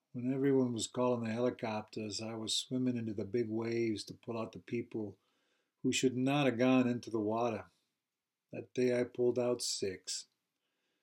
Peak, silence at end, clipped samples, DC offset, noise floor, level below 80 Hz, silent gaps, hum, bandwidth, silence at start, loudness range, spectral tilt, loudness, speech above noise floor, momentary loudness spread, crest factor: -18 dBFS; 0.8 s; under 0.1%; under 0.1%; under -90 dBFS; -84 dBFS; none; none; 16 kHz; 0.15 s; 3 LU; -5 dB/octave; -35 LUFS; over 55 dB; 11 LU; 18 dB